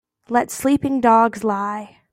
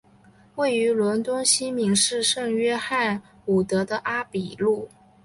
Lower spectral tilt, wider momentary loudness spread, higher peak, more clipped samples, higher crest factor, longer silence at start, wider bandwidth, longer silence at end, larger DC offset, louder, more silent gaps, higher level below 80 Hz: first, -5.5 dB/octave vs -3 dB/octave; about the same, 10 LU vs 8 LU; first, -2 dBFS vs -6 dBFS; neither; about the same, 16 dB vs 18 dB; second, 0.3 s vs 0.55 s; first, 16 kHz vs 11.5 kHz; second, 0.25 s vs 0.4 s; neither; first, -19 LUFS vs -23 LUFS; neither; first, -54 dBFS vs -60 dBFS